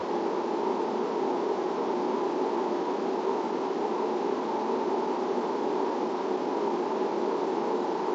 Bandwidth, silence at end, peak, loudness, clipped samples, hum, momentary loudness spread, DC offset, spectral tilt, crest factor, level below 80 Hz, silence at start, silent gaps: 7.8 kHz; 0 s; -16 dBFS; -29 LUFS; under 0.1%; none; 1 LU; under 0.1%; -5.5 dB/octave; 14 dB; -82 dBFS; 0 s; none